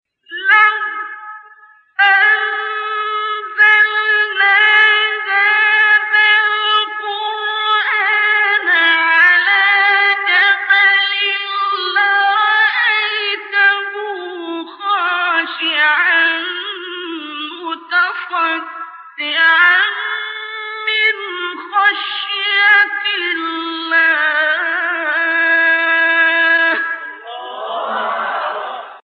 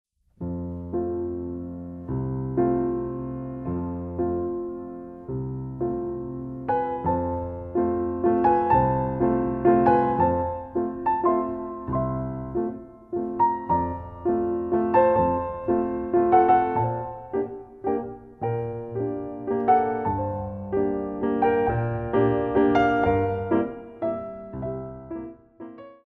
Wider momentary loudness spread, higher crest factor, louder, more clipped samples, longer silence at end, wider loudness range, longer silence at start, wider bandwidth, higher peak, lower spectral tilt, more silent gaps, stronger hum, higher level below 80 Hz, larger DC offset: about the same, 15 LU vs 14 LU; second, 14 dB vs 20 dB; first, -13 LUFS vs -25 LUFS; neither; about the same, 0.15 s vs 0.1 s; about the same, 5 LU vs 7 LU; about the same, 0.3 s vs 0.4 s; first, 6 kHz vs 4.3 kHz; first, -2 dBFS vs -6 dBFS; second, -1.5 dB/octave vs -10.5 dB/octave; neither; neither; second, -82 dBFS vs -46 dBFS; neither